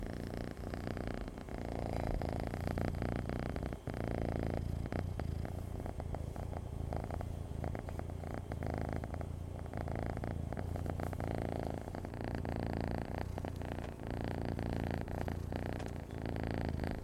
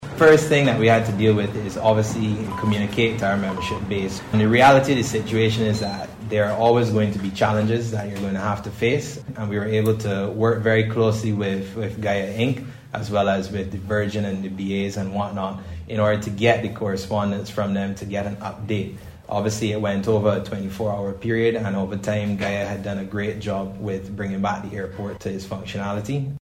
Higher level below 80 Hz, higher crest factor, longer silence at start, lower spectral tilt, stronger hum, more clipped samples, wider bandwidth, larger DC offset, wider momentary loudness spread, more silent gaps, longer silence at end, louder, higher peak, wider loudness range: about the same, -46 dBFS vs -48 dBFS; about the same, 18 dB vs 18 dB; about the same, 0 s vs 0 s; first, -7.5 dB/octave vs -6 dB/octave; neither; neither; about the same, 15.5 kHz vs 16 kHz; neither; second, 5 LU vs 11 LU; neither; about the same, 0 s vs 0.05 s; second, -41 LUFS vs -22 LUFS; second, -20 dBFS vs -4 dBFS; second, 3 LU vs 6 LU